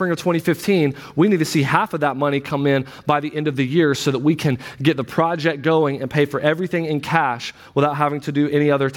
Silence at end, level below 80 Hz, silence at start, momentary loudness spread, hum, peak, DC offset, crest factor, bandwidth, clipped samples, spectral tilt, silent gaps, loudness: 0 s; -58 dBFS; 0 s; 4 LU; none; 0 dBFS; under 0.1%; 18 dB; 17.5 kHz; under 0.1%; -6 dB/octave; none; -19 LUFS